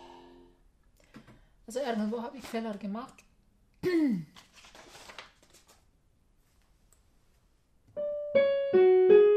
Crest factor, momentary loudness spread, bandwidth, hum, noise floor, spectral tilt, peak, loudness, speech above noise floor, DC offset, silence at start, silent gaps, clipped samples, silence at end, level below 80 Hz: 20 dB; 26 LU; 13.5 kHz; none; -67 dBFS; -6.5 dB/octave; -10 dBFS; -28 LUFS; 34 dB; under 0.1%; 1.7 s; none; under 0.1%; 0 s; -66 dBFS